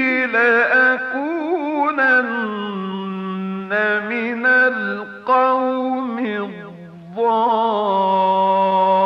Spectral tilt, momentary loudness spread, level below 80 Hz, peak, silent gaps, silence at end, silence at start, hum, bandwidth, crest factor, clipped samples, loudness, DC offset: -7 dB/octave; 12 LU; -68 dBFS; -6 dBFS; none; 0 s; 0 s; none; 6.8 kHz; 12 dB; under 0.1%; -18 LUFS; under 0.1%